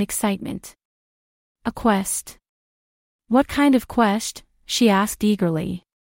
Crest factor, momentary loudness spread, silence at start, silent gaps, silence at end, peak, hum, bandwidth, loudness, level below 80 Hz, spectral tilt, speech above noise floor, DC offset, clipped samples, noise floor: 18 dB; 13 LU; 0 s; 0.85-1.55 s, 2.49-3.19 s; 0.3 s; -4 dBFS; none; 16.5 kHz; -21 LUFS; -50 dBFS; -4.5 dB/octave; over 70 dB; under 0.1%; under 0.1%; under -90 dBFS